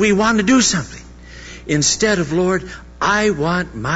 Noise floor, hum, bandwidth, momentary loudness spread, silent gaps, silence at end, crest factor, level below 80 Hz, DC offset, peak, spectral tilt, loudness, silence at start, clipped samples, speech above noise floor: -36 dBFS; none; 8 kHz; 20 LU; none; 0 s; 14 dB; -40 dBFS; under 0.1%; -4 dBFS; -3.5 dB/octave; -16 LUFS; 0 s; under 0.1%; 20 dB